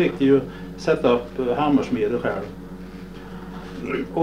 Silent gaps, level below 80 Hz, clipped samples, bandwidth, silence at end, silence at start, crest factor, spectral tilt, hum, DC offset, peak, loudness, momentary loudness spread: none; -46 dBFS; under 0.1%; 10.5 kHz; 0 s; 0 s; 16 dB; -7 dB/octave; none; 0.3%; -6 dBFS; -22 LUFS; 18 LU